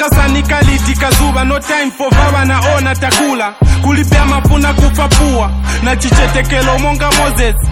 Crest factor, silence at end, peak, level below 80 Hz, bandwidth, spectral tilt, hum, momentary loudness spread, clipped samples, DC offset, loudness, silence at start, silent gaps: 10 dB; 0 s; 0 dBFS; -14 dBFS; 17 kHz; -4.5 dB/octave; none; 3 LU; under 0.1%; under 0.1%; -11 LUFS; 0 s; none